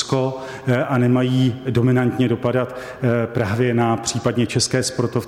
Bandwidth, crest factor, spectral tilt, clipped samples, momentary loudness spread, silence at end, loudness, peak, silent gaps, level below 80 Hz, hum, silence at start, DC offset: 14 kHz; 14 dB; -5.5 dB/octave; under 0.1%; 5 LU; 0 s; -19 LUFS; -6 dBFS; none; -52 dBFS; none; 0 s; under 0.1%